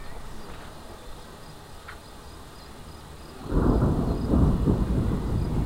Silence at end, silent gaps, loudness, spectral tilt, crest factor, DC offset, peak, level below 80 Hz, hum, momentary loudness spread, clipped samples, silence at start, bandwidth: 0 s; none; -25 LUFS; -8 dB/octave; 18 dB; 0.2%; -8 dBFS; -32 dBFS; none; 21 LU; under 0.1%; 0 s; 16 kHz